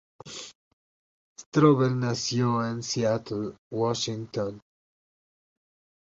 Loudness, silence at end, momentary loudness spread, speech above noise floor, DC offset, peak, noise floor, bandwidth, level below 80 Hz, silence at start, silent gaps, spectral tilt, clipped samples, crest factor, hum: -26 LUFS; 1.45 s; 19 LU; over 64 dB; under 0.1%; -6 dBFS; under -90 dBFS; 8 kHz; -64 dBFS; 0.25 s; 0.55-1.36 s, 1.46-1.52 s, 3.58-3.71 s; -5.5 dB/octave; under 0.1%; 22 dB; none